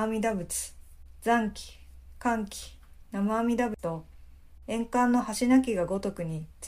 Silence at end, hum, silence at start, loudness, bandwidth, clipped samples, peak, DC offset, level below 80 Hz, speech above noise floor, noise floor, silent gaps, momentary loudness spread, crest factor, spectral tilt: 0 s; none; 0 s; -29 LUFS; 15.5 kHz; under 0.1%; -12 dBFS; under 0.1%; -50 dBFS; 22 dB; -50 dBFS; none; 17 LU; 18 dB; -5 dB/octave